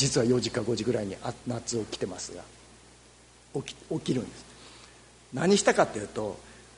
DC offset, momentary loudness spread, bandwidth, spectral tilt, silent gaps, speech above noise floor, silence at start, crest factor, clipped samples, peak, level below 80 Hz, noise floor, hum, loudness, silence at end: under 0.1%; 23 LU; 11 kHz; -4.5 dB/octave; none; 27 dB; 0 s; 22 dB; under 0.1%; -8 dBFS; -58 dBFS; -56 dBFS; none; -29 LUFS; 0.15 s